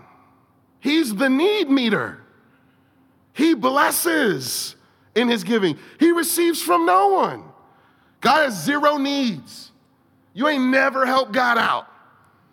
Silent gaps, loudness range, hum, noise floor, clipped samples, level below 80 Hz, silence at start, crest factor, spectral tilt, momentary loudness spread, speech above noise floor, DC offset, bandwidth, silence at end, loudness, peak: none; 3 LU; none; -59 dBFS; under 0.1%; -76 dBFS; 0.85 s; 18 dB; -3.5 dB/octave; 9 LU; 40 dB; under 0.1%; 18 kHz; 0.7 s; -19 LUFS; -4 dBFS